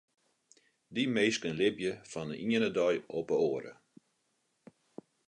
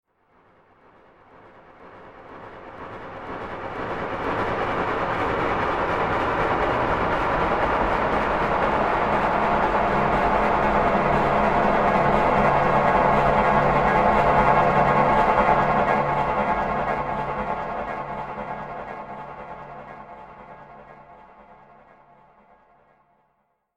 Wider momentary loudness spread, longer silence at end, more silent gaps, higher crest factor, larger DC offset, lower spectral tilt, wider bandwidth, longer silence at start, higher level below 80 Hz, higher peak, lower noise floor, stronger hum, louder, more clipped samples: second, 11 LU vs 19 LU; second, 1.55 s vs 2.6 s; neither; about the same, 18 dB vs 18 dB; neither; second, -4.5 dB/octave vs -7 dB/octave; second, 10 kHz vs 12 kHz; second, 0.9 s vs 1.8 s; second, -72 dBFS vs -40 dBFS; second, -16 dBFS vs -4 dBFS; first, -78 dBFS vs -70 dBFS; neither; second, -32 LUFS vs -21 LUFS; neither